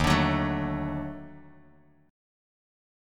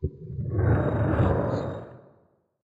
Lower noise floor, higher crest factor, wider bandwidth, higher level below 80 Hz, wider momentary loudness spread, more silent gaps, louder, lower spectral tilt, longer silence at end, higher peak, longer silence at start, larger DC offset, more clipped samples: second, -59 dBFS vs -64 dBFS; first, 22 dB vs 16 dB; first, 16.5 kHz vs 7.2 kHz; about the same, -42 dBFS vs -38 dBFS; first, 20 LU vs 12 LU; neither; about the same, -28 LUFS vs -26 LUFS; second, -6 dB/octave vs -10 dB/octave; first, 1 s vs 0.7 s; first, -8 dBFS vs -12 dBFS; about the same, 0 s vs 0 s; neither; neither